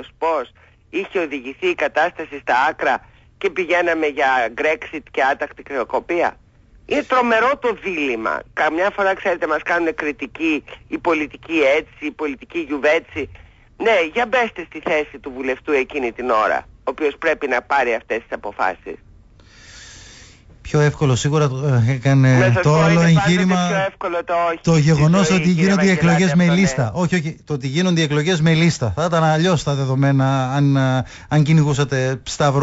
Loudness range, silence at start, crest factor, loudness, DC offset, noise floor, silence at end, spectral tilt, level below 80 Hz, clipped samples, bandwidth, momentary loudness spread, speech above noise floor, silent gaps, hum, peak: 6 LU; 0 s; 12 dB; -18 LUFS; under 0.1%; -46 dBFS; 0 s; -6 dB/octave; -46 dBFS; under 0.1%; 8 kHz; 11 LU; 29 dB; none; none; -6 dBFS